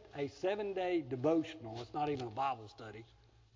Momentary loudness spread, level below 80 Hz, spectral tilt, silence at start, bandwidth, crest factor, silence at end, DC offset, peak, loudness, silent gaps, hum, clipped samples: 16 LU; -68 dBFS; -7 dB/octave; 0 s; 7.6 kHz; 18 dB; 0.5 s; under 0.1%; -20 dBFS; -38 LUFS; none; none; under 0.1%